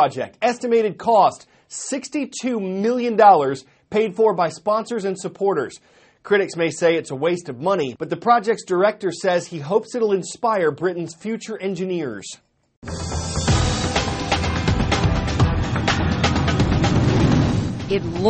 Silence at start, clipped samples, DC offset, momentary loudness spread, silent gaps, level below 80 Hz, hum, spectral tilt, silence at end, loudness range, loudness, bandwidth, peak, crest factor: 0 s; under 0.1%; under 0.1%; 10 LU; 12.77-12.82 s; -34 dBFS; none; -5.5 dB/octave; 0 s; 5 LU; -20 LUFS; 8.8 kHz; 0 dBFS; 20 dB